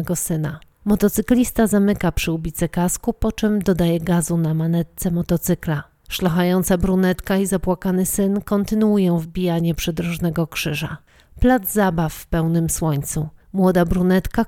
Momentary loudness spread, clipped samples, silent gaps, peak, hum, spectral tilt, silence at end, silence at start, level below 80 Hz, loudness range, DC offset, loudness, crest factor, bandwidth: 7 LU; under 0.1%; none; -4 dBFS; none; -6 dB/octave; 0 s; 0 s; -34 dBFS; 2 LU; under 0.1%; -20 LUFS; 16 dB; 17.5 kHz